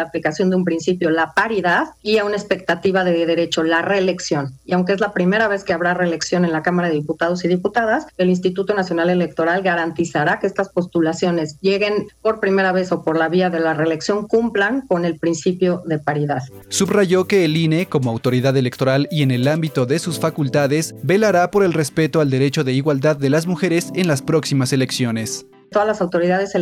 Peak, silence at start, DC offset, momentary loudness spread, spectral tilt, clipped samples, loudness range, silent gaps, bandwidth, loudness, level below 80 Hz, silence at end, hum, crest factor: -6 dBFS; 0 s; under 0.1%; 4 LU; -5.5 dB/octave; under 0.1%; 2 LU; none; 16 kHz; -18 LUFS; -56 dBFS; 0 s; none; 12 dB